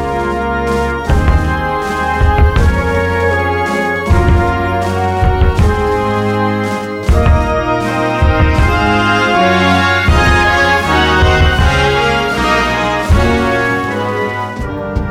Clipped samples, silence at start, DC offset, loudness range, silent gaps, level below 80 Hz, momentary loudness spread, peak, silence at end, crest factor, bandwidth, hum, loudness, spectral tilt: under 0.1%; 0 s; under 0.1%; 3 LU; none; -18 dBFS; 6 LU; 0 dBFS; 0 s; 12 dB; 13.5 kHz; none; -12 LUFS; -6 dB/octave